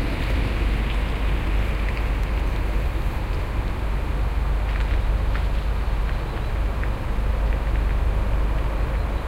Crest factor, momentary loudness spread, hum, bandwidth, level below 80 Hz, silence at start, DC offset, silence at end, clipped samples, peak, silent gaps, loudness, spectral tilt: 12 dB; 3 LU; none; 10 kHz; -22 dBFS; 0 s; under 0.1%; 0 s; under 0.1%; -10 dBFS; none; -26 LUFS; -7 dB/octave